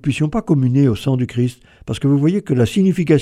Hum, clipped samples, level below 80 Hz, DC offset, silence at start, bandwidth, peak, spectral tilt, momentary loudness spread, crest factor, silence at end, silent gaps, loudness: none; under 0.1%; -44 dBFS; under 0.1%; 0.05 s; 13 kHz; 0 dBFS; -7.5 dB/octave; 7 LU; 16 dB; 0 s; none; -17 LUFS